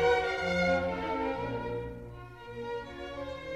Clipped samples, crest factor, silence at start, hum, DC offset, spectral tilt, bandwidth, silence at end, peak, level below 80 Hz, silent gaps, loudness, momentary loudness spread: under 0.1%; 18 dB; 0 s; none; under 0.1%; -5.5 dB/octave; 12 kHz; 0 s; -16 dBFS; -52 dBFS; none; -33 LUFS; 17 LU